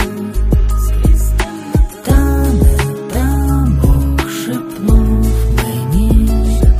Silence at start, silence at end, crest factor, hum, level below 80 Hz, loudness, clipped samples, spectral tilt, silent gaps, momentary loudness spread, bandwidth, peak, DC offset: 0 s; 0 s; 12 dB; none; -14 dBFS; -14 LUFS; under 0.1%; -6.5 dB/octave; none; 6 LU; 15.5 kHz; 0 dBFS; under 0.1%